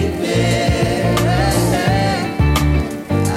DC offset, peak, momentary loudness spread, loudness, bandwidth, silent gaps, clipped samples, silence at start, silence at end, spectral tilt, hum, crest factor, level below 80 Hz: under 0.1%; -4 dBFS; 3 LU; -16 LUFS; 16 kHz; none; under 0.1%; 0 s; 0 s; -5.5 dB/octave; none; 10 dB; -26 dBFS